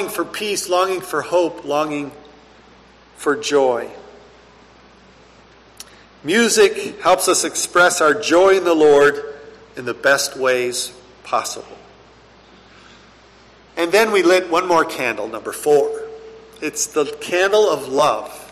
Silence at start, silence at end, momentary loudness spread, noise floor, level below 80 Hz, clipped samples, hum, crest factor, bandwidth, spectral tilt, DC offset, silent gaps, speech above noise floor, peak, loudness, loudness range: 0 s; 0.05 s; 15 LU; -47 dBFS; -56 dBFS; under 0.1%; none; 14 dB; 14 kHz; -2.5 dB/octave; under 0.1%; none; 30 dB; -4 dBFS; -17 LUFS; 9 LU